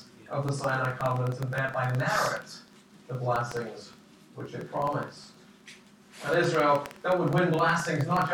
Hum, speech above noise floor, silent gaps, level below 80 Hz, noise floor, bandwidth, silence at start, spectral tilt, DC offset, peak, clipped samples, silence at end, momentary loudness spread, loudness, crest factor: none; 24 dB; none; -64 dBFS; -52 dBFS; 18.5 kHz; 0 s; -6 dB/octave; under 0.1%; -12 dBFS; under 0.1%; 0 s; 16 LU; -28 LUFS; 16 dB